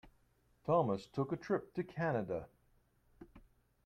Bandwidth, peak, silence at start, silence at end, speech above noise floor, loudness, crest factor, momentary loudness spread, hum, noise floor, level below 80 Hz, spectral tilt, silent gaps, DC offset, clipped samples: 9.4 kHz; -20 dBFS; 0.05 s; 0.45 s; 36 dB; -38 LUFS; 20 dB; 11 LU; none; -73 dBFS; -68 dBFS; -8.5 dB/octave; none; under 0.1%; under 0.1%